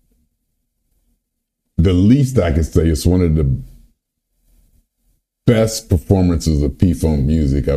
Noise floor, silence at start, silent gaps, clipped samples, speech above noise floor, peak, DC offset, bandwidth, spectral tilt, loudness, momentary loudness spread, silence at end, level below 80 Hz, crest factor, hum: -74 dBFS; 1.8 s; none; under 0.1%; 60 dB; 0 dBFS; under 0.1%; 14.5 kHz; -7 dB/octave; -16 LUFS; 6 LU; 0 s; -28 dBFS; 16 dB; none